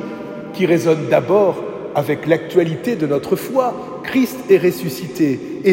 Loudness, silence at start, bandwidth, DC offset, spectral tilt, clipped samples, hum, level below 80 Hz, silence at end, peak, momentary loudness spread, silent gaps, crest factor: -18 LUFS; 0 s; 16.5 kHz; under 0.1%; -6.5 dB/octave; under 0.1%; none; -58 dBFS; 0 s; 0 dBFS; 10 LU; none; 16 dB